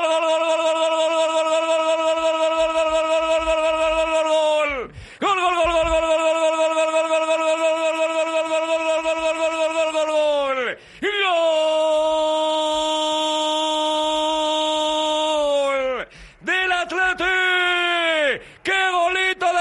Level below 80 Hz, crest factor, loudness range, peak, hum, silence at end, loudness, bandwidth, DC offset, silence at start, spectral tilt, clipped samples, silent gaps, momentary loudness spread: -48 dBFS; 12 dB; 1 LU; -8 dBFS; none; 0 s; -20 LUFS; 11.5 kHz; under 0.1%; 0 s; -2 dB/octave; under 0.1%; none; 3 LU